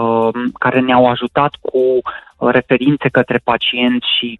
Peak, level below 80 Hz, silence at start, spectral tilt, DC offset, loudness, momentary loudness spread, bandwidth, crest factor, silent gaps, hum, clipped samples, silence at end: 0 dBFS; -50 dBFS; 0 s; -7.5 dB/octave; under 0.1%; -14 LUFS; 5 LU; 4.3 kHz; 14 dB; none; none; under 0.1%; 0.05 s